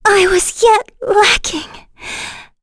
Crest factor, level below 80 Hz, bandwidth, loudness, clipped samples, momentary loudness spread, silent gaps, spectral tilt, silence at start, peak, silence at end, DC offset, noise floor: 14 dB; -36 dBFS; 11 kHz; -12 LUFS; under 0.1%; 17 LU; none; -1.5 dB/octave; 0.05 s; 0 dBFS; 0.2 s; under 0.1%; -32 dBFS